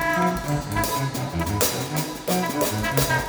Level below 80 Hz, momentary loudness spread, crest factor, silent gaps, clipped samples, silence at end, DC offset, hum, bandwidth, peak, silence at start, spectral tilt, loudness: -40 dBFS; 5 LU; 22 dB; none; under 0.1%; 0 s; under 0.1%; none; over 20 kHz; -2 dBFS; 0 s; -4 dB/octave; -24 LUFS